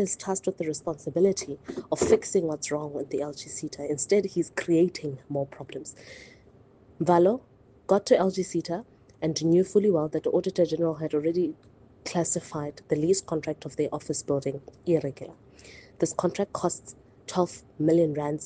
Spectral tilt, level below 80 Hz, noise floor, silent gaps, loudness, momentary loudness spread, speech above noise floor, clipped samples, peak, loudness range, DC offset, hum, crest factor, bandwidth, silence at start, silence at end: -5.5 dB/octave; -64 dBFS; -56 dBFS; none; -27 LUFS; 13 LU; 29 dB; under 0.1%; -8 dBFS; 5 LU; under 0.1%; none; 20 dB; 9.6 kHz; 0 s; 0 s